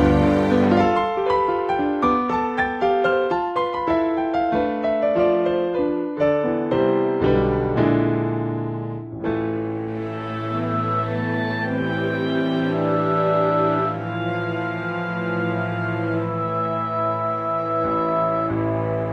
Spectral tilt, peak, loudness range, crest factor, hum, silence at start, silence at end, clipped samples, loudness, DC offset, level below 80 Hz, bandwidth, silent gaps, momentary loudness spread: -8.5 dB/octave; -4 dBFS; 4 LU; 16 dB; none; 0 s; 0 s; under 0.1%; -21 LUFS; under 0.1%; -42 dBFS; 8.2 kHz; none; 7 LU